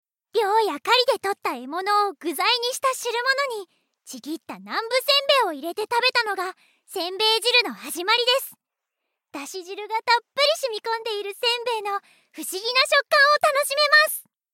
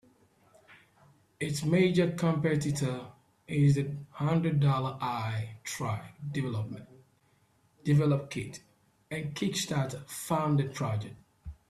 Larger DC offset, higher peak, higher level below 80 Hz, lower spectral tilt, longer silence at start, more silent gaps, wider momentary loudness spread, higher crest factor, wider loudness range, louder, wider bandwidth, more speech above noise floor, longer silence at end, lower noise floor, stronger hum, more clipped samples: neither; first, -4 dBFS vs -14 dBFS; second, -88 dBFS vs -60 dBFS; second, 0 dB/octave vs -6 dB/octave; second, 0.35 s vs 0.7 s; neither; first, 17 LU vs 14 LU; about the same, 18 dB vs 18 dB; about the same, 4 LU vs 5 LU; first, -21 LUFS vs -31 LUFS; first, 17 kHz vs 14 kHz; first, 60 dB vs 39 dB; first, 0.3 s vs 0.15 s; first, -82 dBFS vs -68 dBFS; neither; neither